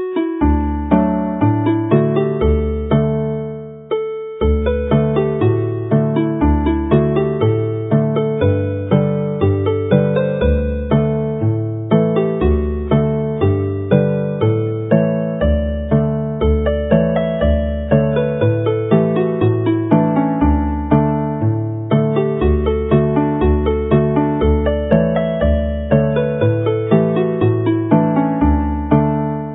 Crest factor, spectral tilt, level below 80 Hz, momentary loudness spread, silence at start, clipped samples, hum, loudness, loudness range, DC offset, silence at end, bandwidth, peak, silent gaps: 16 dB; -13 dB/octave; -24 dBFS; 4 LU; 0 s; under 0.1%; none; -16 LUFS; 1 LU; under 0.1%; 0 s; 3.9 kHz; 0 dBFS; none